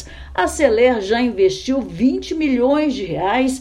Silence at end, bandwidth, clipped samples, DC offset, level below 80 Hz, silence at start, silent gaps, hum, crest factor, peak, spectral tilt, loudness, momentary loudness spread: 0 s; 13 kHz; under 0.1%; under 0.1%; -40 dBFS; 0 s; none; none; 16 dB; 0 dBFS; -4.5 dB/octave; -18 LUFS; 7 LU